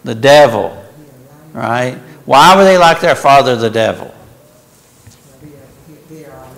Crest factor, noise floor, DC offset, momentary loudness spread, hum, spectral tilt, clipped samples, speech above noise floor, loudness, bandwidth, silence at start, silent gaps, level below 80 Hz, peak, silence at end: 12 dB; -45 dBFS; under 0.1%; 17 LU; none; -4.5 dB/octave; under 0.1%; 37 dB; -9 LUFS; 16 kHz; 0.05 s; none; -46 dBFS; 0 dBFS; 0.35 s